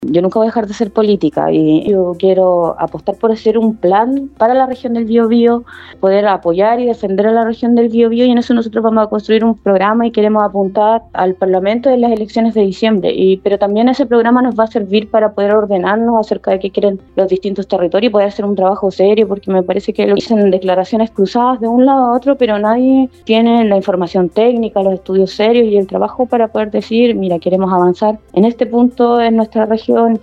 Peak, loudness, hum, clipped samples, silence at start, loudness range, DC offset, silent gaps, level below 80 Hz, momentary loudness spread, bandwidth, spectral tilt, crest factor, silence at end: 0 dBFS; -12 LUFS; none; under 0.1%; 0 s; 2 LU; under 0.1%; none; -48 dBFS; 5 LU; 7.6 kHz; -7.5 dB/octave; 10 dB; 0.05 s